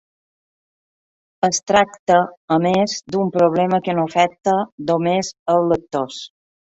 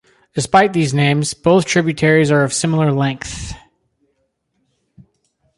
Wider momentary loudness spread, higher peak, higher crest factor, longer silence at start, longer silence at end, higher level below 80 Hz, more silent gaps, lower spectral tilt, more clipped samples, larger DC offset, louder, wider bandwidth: second, 6 LU vs 14 LU; about the same, 0 dBFS vs -2 dBFS; about the same, 18 dB vs 16 dB; first, 1.45 s vs 0.35 s; second, 0.4 s vs 2 s; second, -56 dBFS vs -44 dBFS; first, 1.99-2.07 s, 2.37-2.48 s, 4.72-4.78 s, 5.39-5.46 s vs none; about the same, -5 dB/octave vs -5 dB/octave; neither; neither; second, -18 LUFS vs -15 LUFS; second, 8.2 kHz vs 11.5 kHz